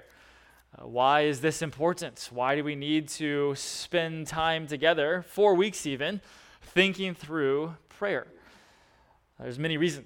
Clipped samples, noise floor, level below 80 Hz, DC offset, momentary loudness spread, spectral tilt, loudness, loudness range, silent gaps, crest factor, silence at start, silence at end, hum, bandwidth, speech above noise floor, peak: under 0.1%; -63 dBFS; -62 dBFS; under 0.1%; 11 LU; -4.5 dB/octave; -28 LUFS; 4 LU; none; 22 dB; 0.75 s; 0 s; none; 18 kHz; 35 dB; -8 dBFS